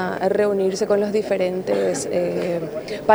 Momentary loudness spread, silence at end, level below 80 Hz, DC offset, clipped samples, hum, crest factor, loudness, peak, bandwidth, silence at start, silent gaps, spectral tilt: 5 LU; 0 s; -56 dBFS; under 0.1%; under 0.1%; none; 20 dB; -21 LUFS; 0 dBFS; over 20 kHz; 0 s; none; -5 dB/octave